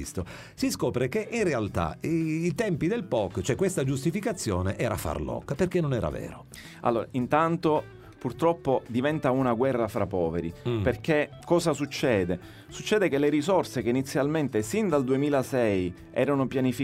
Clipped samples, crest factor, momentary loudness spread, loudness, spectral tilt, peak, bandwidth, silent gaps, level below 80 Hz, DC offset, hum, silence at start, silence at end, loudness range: under 0.1%; 18 dB; 7 LU; -27 LUFS; -6 dB/octave; -10 dBFS; 16 kHz; none; -50 dBFS; under 0.1%; none; 0 s; 0 s; 2 LU